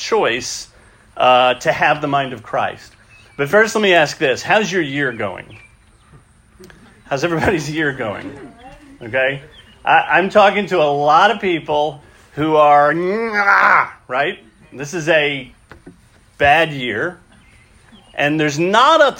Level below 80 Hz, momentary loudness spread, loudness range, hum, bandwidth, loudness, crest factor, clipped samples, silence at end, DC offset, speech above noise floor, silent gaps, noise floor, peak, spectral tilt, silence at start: -50 dBFS; 14 LU; 8 LU; none; 16.5 kHz; -15 LUFS; 16 dB; under 0.1%; 0 s; under 0.1%; 33 dB; none; -48 dBFS; 0 dBFS; -4 dB/octave; 0 s